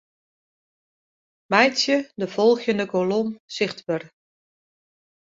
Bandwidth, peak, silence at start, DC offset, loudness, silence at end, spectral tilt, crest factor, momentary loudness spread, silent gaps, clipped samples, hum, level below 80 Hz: 7.8 kHz; -2 dBFS; 1.5 s; under 0.1%; -22 LUFS; 1.2 s; -4 dB/octave; 24 dB; 11 LU; 3.40-3.48 s; under 0.1%; none; -70 dBFS